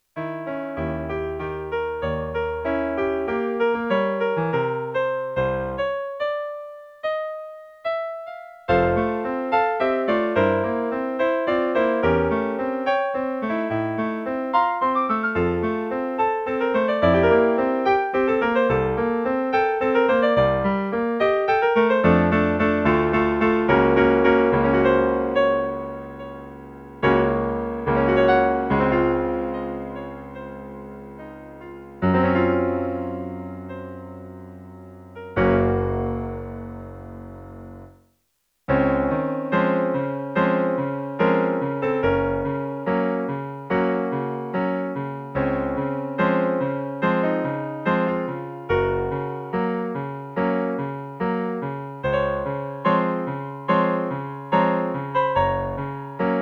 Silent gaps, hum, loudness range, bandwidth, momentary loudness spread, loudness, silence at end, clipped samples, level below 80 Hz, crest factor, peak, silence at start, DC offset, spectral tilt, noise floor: none; none; 7 LU; 6.4 kHz; 17 LU; -22 LUFS; 0 s; under 0.1%; -44 dBFS; 18 dB; -4 dBFS; 0.15 s; under 0.1%; -8.5 dB/octave; -71 dBFS